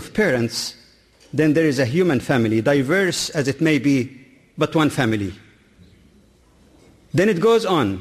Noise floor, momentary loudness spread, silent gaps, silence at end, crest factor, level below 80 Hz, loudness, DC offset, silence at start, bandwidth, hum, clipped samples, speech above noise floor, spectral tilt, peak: -53 dBFS; 8 LU; none; 0 s; 14 dB; -54 dBFS; -19 LUFS; under 0.1%; 0 s; 15 kHz; none; under 0.1%; 35 dB; -5.5 dB/octave; -6 dBFS